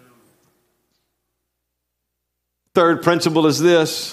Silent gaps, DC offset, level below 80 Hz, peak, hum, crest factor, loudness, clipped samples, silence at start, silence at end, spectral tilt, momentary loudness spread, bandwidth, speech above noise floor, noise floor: none; under 0.1%; -68 dBFS; 0 dBFS; 60 Hz at -55 dBFS; 20 dB; -16 LUFS; under 0.1%; 2.75 s; 0 s; -4.5 dB/octave; 2 LU; 14.5 kHz; 62 dB; -77 dBFS